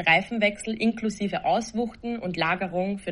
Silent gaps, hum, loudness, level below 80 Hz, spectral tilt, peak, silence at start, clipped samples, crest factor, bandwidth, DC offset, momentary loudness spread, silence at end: none; none; -26 LUFS; -56 dBFS; -5 dB/octave; -6 dBFS; 0 s; under 0.1%; 20 dB; 11 kHz; under 0.1%; 8 LU; 0 s